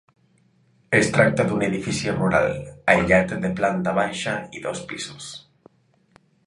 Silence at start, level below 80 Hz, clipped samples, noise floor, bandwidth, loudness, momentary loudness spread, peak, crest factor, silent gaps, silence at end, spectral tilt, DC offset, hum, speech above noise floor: 0.9 s; -48 dBFS; under 0.1%; -61 dBFS; 11.5 kHz; -22 LUFS; 14 LU; -2 dBFS; 22 dB; none; 1.1 s; -5 dB/octave; under 0.1%; none; 39 dB